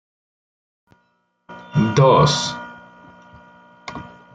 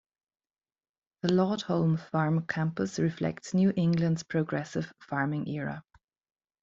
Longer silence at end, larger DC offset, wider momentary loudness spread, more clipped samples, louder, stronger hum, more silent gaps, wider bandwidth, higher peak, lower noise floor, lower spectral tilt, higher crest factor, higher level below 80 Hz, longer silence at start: second, 0.3 s vs 0.8 s; neither; first, 25 LU vs 9 LU; neither; first, -16 LUFS vs -29 LUFS; neither; neither; first, 9.2 kHz vs 7.8 kHz; first, -2 dBFS vs -12 dBFS; second, -66 dBFS vs under -90 dBFS; second, -5.5 dB/octave vs -7 dB/octave; about the same, 20 dB vs 18 dB; first, -50 dBFS vs -66 dBFS; first, 1.5 s vs 1.25 s